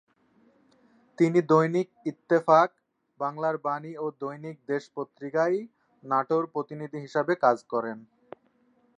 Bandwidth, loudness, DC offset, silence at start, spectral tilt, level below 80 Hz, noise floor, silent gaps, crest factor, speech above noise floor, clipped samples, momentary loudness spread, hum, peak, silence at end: 9 kHz; -27 LUFS; under 0.1%; 1.2 s; -7.5 dB/octave; -82 dBFS; -66 dBFS; none; 22 dB; 40 dB; under 0.1%; 15 LU; none; -6 dBFS; 1 s